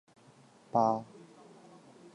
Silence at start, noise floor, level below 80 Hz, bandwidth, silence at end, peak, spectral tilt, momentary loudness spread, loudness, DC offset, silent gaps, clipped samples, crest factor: 0.75 s; -60 dBFS; -80 dBFS; 11 kHz; 1.1 s; -14 dBFS; -7.5 dB/octave; 26 LU; -31 LUFS; under 0.1%; none; under 0.1%; 22 dB